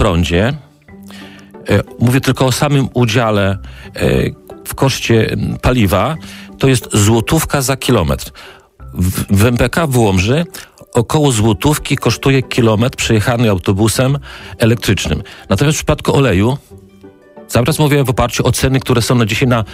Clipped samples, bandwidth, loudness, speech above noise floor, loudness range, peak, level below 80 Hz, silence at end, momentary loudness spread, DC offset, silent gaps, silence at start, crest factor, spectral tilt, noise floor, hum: under 0.1%; 16 kHz; -13 LUFS; 27 dB; 2 LU; -2 dBFS; -30 dBFS; 0 s; 10 LU; under 0.1%; none; 0 s; 12 dB; -5.5 dB/octave; -40 dBFS; none